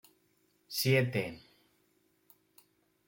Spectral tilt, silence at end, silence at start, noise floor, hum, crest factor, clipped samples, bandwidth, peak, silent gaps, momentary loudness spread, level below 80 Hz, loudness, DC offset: -5 dB/octave; 1.7 s; 0.7 s; -73 dBFS; none; 20 dB; under 0.1%; 17 kHz; -16 dBFS; none; 15 LU; -72 dBFS; -31 LUFS; under 0.1%